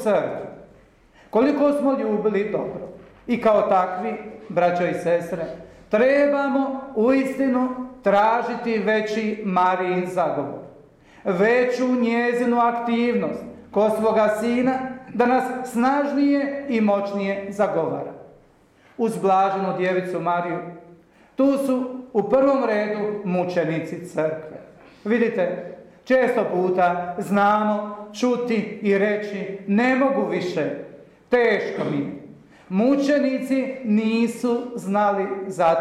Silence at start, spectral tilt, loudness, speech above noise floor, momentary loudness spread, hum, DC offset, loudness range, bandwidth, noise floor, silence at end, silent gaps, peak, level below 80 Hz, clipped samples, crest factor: 0 s; -6.5 dB/octave; -22 LUFS; 34 dB; 11 LU; none; under 0.1%; 3 LU; 13.5 kHz; -55 dBFS; 0 s; none; -8 dBFS; -62 dBFS; under 0.1%; 12 dB